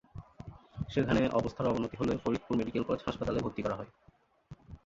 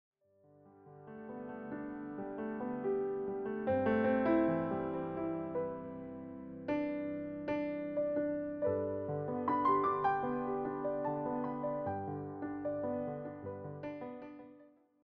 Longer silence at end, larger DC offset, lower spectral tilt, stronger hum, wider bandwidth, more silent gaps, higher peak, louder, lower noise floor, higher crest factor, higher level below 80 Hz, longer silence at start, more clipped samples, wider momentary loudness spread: second, 0.1 s vs 0.35 s; neither; about the same, -7.5 dB/octave vs -7 dB/octave; neither; first, 7.8 kHz vs 5.2 kHz; neither; first, -14 dBFS vs -20 dBFS; first, -33 LUFS vs -37 LUFS; second, -55 dBFS vs -66 dBFS; about the same, 20 dB vs 16 dB; first, -52 dBFS vs -68 dBFS; second, 0.15 s vs 0.65 s; neither; first, 20 LU vs 15 LU